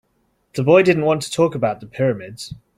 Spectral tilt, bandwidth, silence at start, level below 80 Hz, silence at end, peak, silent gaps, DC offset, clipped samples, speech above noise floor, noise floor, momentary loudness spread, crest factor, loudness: -6 dB/octave; 15 kHz; 0.55 s; -56 dBFS; 0.2 s; -2 dBFS; none; under 0.1%; under 0.1%; 47 dB; -65 dBFS; 17 LU; 18 dB; -18 LUFS